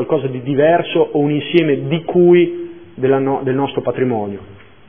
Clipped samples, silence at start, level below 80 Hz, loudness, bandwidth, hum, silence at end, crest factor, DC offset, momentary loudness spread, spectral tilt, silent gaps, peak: under 0.1%; 0 s; -56 dBFS; -15 LUFS; 3.6 kHz; none; 0.3 s; 16 dB; 0.6%; 10 LU; -10.5 dB/octave; none; 0 dBFS